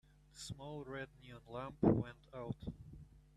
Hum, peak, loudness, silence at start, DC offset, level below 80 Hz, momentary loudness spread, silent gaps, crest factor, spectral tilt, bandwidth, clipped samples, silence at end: none; -20 dBFS; -42 LUFS; 0.35 s; under 0.1%; -60 dBFS; 23 LU; none; 24 dB; -7 dB/octave; 13.5 kHz; under 0.1%; 0.15 s